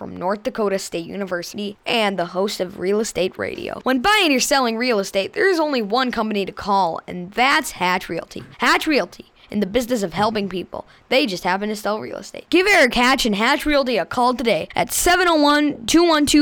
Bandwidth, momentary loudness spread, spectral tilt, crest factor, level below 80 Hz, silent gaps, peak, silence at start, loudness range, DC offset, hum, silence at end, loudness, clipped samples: over 20 kHz; 12 LU; -3 dB/octave; 14 dB; -44 dBFS; none; -6 dBFS; 0 s; 5 LU; under 0.1%; none; 0 s; -19 LUFS; under 0.1%